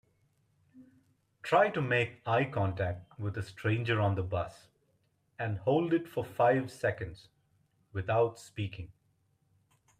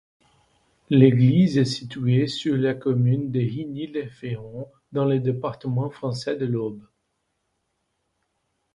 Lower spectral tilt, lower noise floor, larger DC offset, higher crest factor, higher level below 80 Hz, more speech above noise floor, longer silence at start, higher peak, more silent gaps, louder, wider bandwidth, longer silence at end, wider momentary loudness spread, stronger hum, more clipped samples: about the same, -7 dB/octave vs -8 dB/octave; about the same, -74 dBFS vs -75 dBFS; neither; about the same, 20 dB vs 22 dB; about the same, -64 dBFS vs -60 dBFS; second, 43 dB vs 53 dB; second, 0.75 s vs 0.9 s; second, -12 dBFS vs -2 dBFS; neither; second, -32 LUFS vs -23 LUFS; first, 14.5 kHz vs 10.5 kHz; second, 1.15 s vs 1.95 s; about the same, 13 LU vs 15 LU; neither; neither